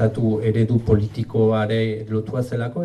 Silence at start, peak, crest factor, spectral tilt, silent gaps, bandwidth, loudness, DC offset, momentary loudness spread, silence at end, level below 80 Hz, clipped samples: 0 s; -2 dBFS; 18 dB; -9 dB/octave; none; 9.6 kHz; -21 LUFS; under 0.1%; 6 LU; 0 s; -42 dBFS; under 0.1%